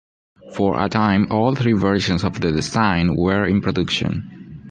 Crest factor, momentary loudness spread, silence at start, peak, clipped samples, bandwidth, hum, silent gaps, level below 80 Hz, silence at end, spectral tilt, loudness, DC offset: 16 dB; 8 LU; 0.45 s; -4 dBFS; under 0.1%; 9.8 kHz; none; none; -38 dBFS; 0 s; -6 dB/octave; -19 LUFS; under 0.1%